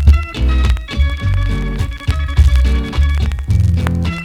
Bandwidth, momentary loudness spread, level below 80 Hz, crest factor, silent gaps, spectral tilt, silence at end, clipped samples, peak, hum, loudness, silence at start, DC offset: 10 kHz; 6 LU; -14 dBFS; 14 dB; none; -6.5 dB/octave; 0 s; 0.2%; 0 dBFS; none; -16 LUFS; 0 s; under 0.1%